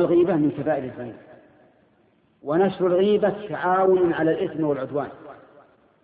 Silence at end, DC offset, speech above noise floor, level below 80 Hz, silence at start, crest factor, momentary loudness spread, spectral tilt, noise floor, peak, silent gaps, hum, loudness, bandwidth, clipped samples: 0.7 s; under 0.1%; 40 dB; -62 dBFS; 0 s; 14 dB; 16 LU; -11.5 dB/octave; -61 dBFS; -8 dBFS; none; none; -22 LUFS; 4.7 kHz; under 0.1%